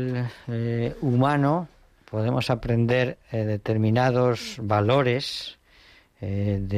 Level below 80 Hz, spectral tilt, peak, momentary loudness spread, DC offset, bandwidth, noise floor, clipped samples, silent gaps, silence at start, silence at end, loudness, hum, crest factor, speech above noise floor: -50 dBFS; -7 dB/octave; -10 dBFS; 10 LU; under 0.1%; 13.5 kHz; -55 dBFS; under 0.1%; none; 0 s; 0 s; -24 LUFS; none; 16 dB; 31 dB